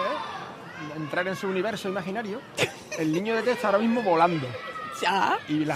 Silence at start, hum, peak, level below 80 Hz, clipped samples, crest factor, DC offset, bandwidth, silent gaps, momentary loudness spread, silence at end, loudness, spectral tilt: 0 s; none; -8 dBFS; -70 dBFS; under 0.1%; 20 dB; under 0.1%; 15 kHz; none; 12 LU; 0 s; -27 LUFS; -5 dB/octave